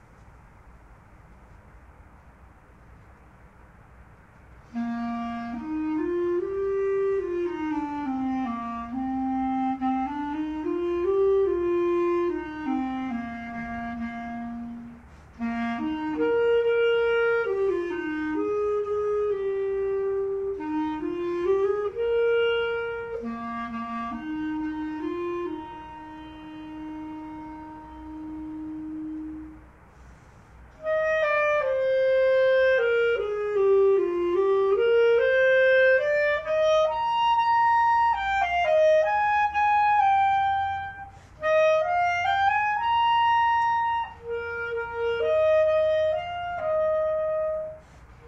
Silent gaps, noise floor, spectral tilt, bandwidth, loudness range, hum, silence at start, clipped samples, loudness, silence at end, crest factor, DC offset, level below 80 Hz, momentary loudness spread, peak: none; -52 dBFS; -6 dB/octave; 7.8 kHz; 14 LU; none; 0.2 s; under 0.1%; -25 LUFS; 0 s; 14 dB; under 0.1%; -54 dBFS; 15 LU; -10 dBFS